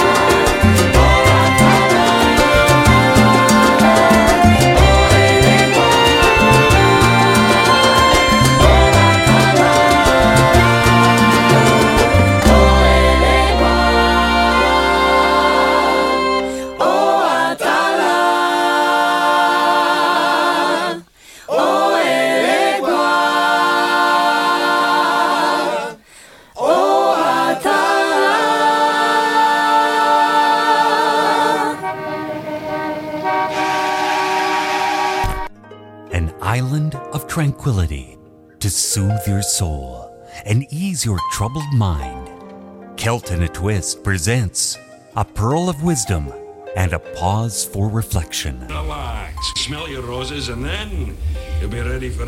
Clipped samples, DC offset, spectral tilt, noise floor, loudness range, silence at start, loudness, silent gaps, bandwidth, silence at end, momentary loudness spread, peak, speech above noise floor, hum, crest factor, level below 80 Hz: under 0.1%; under 0.1%; -4.5 dB/octave; -44 dBFS; 11 LU; 0 s; -14 LUFS; none; 17 kHz; 0 s; 13 LU; 0 dBFS; 24 dB; none; 14 dB; -26 dBFS